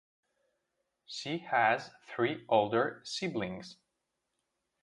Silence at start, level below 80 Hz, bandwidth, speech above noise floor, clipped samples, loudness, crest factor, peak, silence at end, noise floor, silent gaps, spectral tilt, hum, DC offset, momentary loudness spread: 1.1 s; -74 dBFS; 11.5 kHz; 52 dB; under 0.1%; -32 LUFS; 22 dB; -14 dBFS; 1.1 s; -84 dBFS; none; -4.5 dB/octave; none; under 0.1%; 16 LU